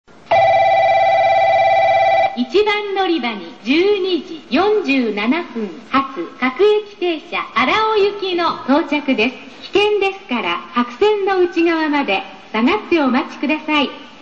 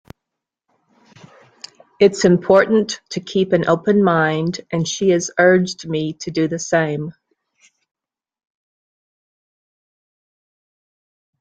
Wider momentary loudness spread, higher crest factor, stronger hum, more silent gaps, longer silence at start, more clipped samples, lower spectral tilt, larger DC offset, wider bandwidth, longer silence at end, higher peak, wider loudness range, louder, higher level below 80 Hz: about the same, 8 LU vs 10 LU; about the same, 14 dB vs 18 dB; neither; neither; second, 0.3 s vs 2 s; neither; about the same, -5 dB/octave vs -5.5 dB/octave; first, 0.4% vs under 0.1%; second, 7.6 kHz vs 9.2 kHz; second, 0.15 s vs 4.3 s; second, -4 dBFS vs 0 dBFS; second, 3 LU vs 9 LU; about the same, -16 LUFS vs -17 LUFS; first, -54 dBFS vs -60 dBFS